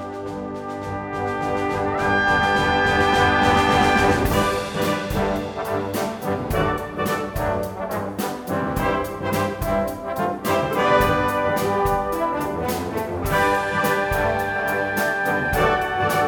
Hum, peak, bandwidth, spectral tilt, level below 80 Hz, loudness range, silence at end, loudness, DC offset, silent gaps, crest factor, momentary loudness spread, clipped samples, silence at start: none; -4 dBFS; over 20 kHz; -5 dB/octave; -38 dBFS; 6 LU; 0 s; -21 LUFS; under 0.1%; none; 16 dB; 9 LU; under 0.1%; 0 s